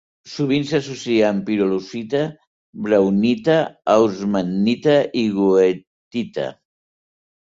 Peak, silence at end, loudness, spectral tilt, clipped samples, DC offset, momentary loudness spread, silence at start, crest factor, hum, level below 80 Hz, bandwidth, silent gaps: -2 dBFS; 0.95 s; -19 LUFS; -6.5 dB/octave; under 0.1%; under 0.1%; 11 LU; 0.25 s; 16 dB; none; -58 dBFS; 7.8 kHz; 2.47-2.73 s, 5.87-6.11 s